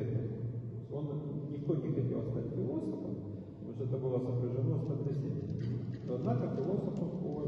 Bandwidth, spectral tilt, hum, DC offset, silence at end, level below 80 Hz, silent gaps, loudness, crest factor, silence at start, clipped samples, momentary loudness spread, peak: 5.8 kHz; -11 dB/octave; none; under 0.1%; 0 s; -62 dBFS; none; -37 LUFS; 16 dB; 0 s; under 0.1%; 7 LU; -20 dBFS